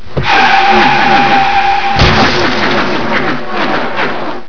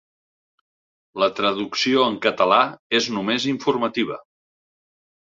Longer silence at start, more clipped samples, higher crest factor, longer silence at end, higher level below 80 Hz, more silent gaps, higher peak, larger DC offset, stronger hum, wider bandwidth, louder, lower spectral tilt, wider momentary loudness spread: second, 0 s vs 1.15 s; first, 1% vs under 0.1%; second, 12 dB vs 22 dB; second, 0 s vs 1 s; first, -28 dBFS vs -66 dBFS; second, none vs 2.79-2.90 s; about the same, 0 dBFS vs -2 dBFS; first, 20% vs under 0.1%; neither; second, 5.4 kHz vs 7.8 kHz; first, -9 LUFS vs -21 LUFS; about the same, -5 dB/octave vs -4 dB/octave; about the same, 8 LU vs 8 LU